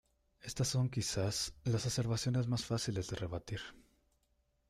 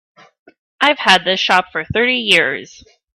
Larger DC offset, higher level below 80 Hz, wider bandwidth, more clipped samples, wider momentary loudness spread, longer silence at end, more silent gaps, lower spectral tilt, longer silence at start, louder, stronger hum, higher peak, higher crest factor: neither; second, -58 dBFS vs -50 dBFS; second, 14 kHz vs 16 kHz; neither; first, 11 LU vs 8 LU; first, 0.9 s vs 0.5 s; neither; first, -4.5 dB/octave vs -3 dB/octave; second, 0.45 s vs 0.8 s; second, -37 LUFS vs -13 LUFS; neither; second, -24 dBFS vs 0 dBFS; about the same, 14 dB vs 16 dB